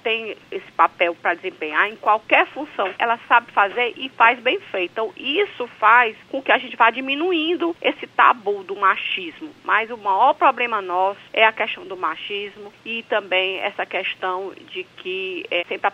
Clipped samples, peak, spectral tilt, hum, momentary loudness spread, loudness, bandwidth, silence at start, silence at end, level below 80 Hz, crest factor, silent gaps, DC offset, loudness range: under 0.1%; -2 dBFS; -4 dB/octave; none; 12 LU; -20 LUFS; 8.4 kHz; 0.05 s; 0.05 s; -72 dBFS; 20 dB; none; under 0.1%; 6 LU